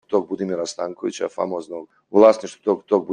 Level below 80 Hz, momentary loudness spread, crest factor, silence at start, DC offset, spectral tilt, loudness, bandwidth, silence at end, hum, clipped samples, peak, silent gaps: -66 dBFS; 14 LU; 18 dB; 0.1 s; under 0.1%; -5.5 dB/octave; -21 LUFS; 10 kHz; 0 s; none; under 0.1%; -2 dBFS; none